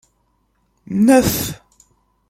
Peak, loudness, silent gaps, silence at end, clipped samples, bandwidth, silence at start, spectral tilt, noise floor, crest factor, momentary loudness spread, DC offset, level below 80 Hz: -2 dBFS; -16 LUFS; none; 0.75 s; under 0.1%; 16.5 kHz; 0.9 s; -5 dB/octave; -64 dBFS; 18 dB; 15 LU; under 0.1%; -44 dBFS